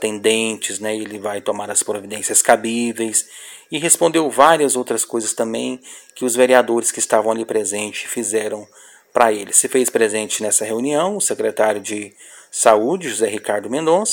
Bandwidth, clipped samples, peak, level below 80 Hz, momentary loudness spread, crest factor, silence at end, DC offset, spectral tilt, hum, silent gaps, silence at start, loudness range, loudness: 17 kHz; under 0.1%; 0 dBFS; -66 dBFS; 12 LU; 18 dB; 0 s; under 0.1%; -2 dB/octave; none; none; 0 s; 2 LU; -17 LUFS